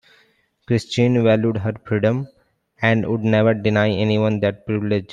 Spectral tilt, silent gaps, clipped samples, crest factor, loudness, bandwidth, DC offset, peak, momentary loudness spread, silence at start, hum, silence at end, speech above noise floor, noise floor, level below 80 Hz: -7.5 dB/octave; none; under 0.1%; 18 dB; -19 LUFS; 9.6 kHz; under 0.1%; -2 dBFS; 7 LU; 0.7 s; none; 0 s; 42 dB; -60 dBFS; -56 dBFS